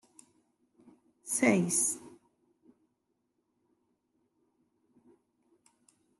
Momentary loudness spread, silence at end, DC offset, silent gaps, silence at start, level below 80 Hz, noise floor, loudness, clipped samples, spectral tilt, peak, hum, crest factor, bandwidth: 15 LU; 4.1 s; under 0.1%; none; 1.25 s; -88 dBFS; -80 dBFS; -29 LUFS; under 0.1%; -4 dB/octave; -12 dBFS; none; 26 dB; 12.5 kHz